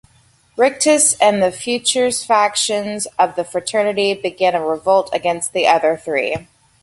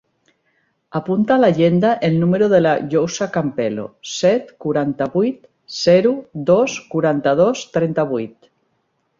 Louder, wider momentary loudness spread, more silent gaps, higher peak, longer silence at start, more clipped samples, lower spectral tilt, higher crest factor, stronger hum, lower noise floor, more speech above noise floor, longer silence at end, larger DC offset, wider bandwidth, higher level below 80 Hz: about the same, -16 LUFS vs -17 LUFS; about the same, 8 LU vs 10 LU; neither; about the same, 0 dBFS vs -2 dBFS; second, 0.55 s vs 0.95 s; neither; second, -2 dB/octave vs -6 dB/octave; about the same, 16 dB vs 16 dB; neither; second, -54 dBFS vs -67 dBFS; second, 38 dB vs 51 dB; second, 0.4 s vs 0.9 s; neither; first, 12 kHz vs 7.6 kHz; about the same, -58 dBFS vs -58 dBFS